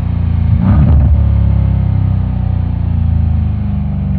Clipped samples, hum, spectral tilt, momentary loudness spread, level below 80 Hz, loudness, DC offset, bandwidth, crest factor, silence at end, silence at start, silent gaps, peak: under 0.1%; none; -12.5 dB/octave; 6 LU; -16 dBFS; -13 LUFS; under 0.1%; 4.1 kHz; 10 dB; 0 s; 0 s; none; 0 dBFS